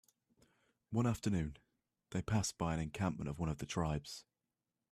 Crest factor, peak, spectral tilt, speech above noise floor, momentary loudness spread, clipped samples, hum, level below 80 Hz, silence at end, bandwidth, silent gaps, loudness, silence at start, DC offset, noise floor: 18 dB; -22 dBFS; -5.5 dB/octave; over 52 dB; 8 LU; under 0.1%; none; -58 dBFS; 0.7 s; 15 kHz; none; -39 LUFS; 0.9 s; under 0.1%; under -90 dBFS